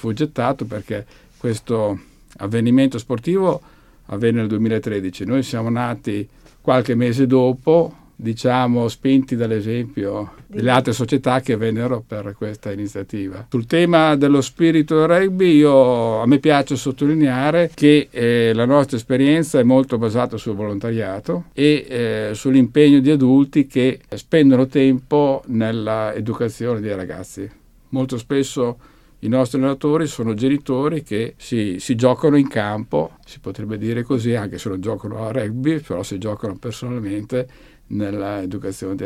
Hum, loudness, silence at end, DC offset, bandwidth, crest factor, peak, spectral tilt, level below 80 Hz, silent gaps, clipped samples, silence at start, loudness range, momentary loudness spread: none; -18 LUFS; 0 s; under 0.1%; 13.5 kHz; 18 dB; 0 dBFS; -7 dB/octave; -50 dBFS; none; under 0.1%; 0.05 s; 8 LU; 13 LU